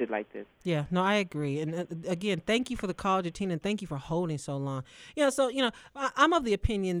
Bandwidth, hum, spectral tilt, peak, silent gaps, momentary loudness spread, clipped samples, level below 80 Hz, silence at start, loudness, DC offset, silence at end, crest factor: 15.5 kHz; none; -5.5 dB/octave; -10 dBFS; none; 9 LU; under 0.1%; -46 dBFS; 0 s; -30 LUFS; under 0.1%; 0 s; 20 dB